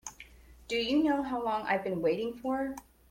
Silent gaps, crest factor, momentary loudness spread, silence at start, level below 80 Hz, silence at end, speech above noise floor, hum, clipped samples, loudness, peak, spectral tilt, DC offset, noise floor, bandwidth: none; 16 dB; 14 LU; 0.05 s; -60 dBFS; 0.3 s; 23 dB; none; under 0.1%; -31 LUFS; -16 dBFS; -4.5 dB/octave; under 0.1%; -54 dBFS; 16.5 kHz